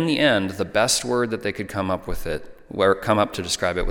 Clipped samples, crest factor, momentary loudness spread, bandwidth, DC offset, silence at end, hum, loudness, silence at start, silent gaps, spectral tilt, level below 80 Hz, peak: under 0.1%; 18 dB; 11 LU; 17.5 kHz; under 0.1%; 0 s; none; -22 LUFS; 0 s; none; -3.5 dB/octave; -38 dBFS; -4 dBFS